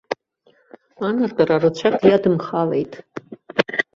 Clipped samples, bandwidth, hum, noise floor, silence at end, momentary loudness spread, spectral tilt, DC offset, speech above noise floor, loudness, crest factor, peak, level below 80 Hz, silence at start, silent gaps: under 0.1%; 7.4 kHz; none; -59 dBFS; 0.15 s; 16 LU; -7 dB/octave; under 0.1%; 41 dB; -19 LUFS; 20 dB; -2 dBFS; -58 dBFS; 0.1 s; none